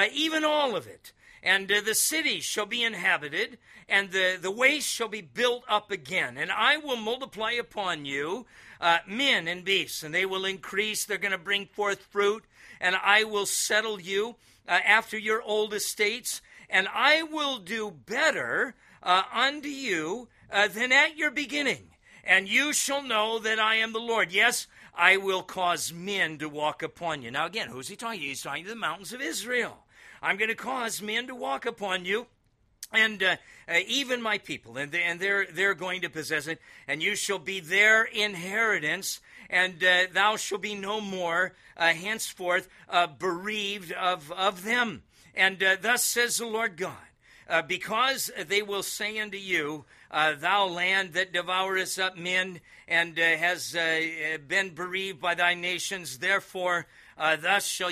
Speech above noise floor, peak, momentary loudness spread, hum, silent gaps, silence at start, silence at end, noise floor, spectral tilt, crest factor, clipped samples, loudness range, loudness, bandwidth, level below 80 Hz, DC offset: 39 dB; -4 dBFS; 10 LU; none; none; 0 s; 0 s; -67 dBFS; -1.5 dB/octave; 24 dB; under 0.1%; 4 LU; -26 LUFS; 15.5 kHz; -70 dBFS; under 0.1%